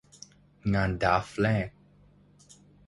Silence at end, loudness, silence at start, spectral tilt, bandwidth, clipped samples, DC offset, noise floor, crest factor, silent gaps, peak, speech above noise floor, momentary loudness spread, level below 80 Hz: 1.2 s; -28 LUFS; 0.65 s; -6.5 dB/octave; 11.5 kHz; under 0.1%; under 0.1%; -59 dBFS; 22 dB; none; -10 dBFS; 32 dB; 18 LU; -48 dBFS